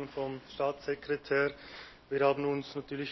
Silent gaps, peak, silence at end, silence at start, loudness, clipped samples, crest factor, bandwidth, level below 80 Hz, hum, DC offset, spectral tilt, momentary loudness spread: none; -16 dBFS; 0 s; 0 s; -33 LUFS; under 0.1%; 18 dB; 6 kHz; -64 dBFS; none; under 0.1%; -6.5 dB/octave; 13 LU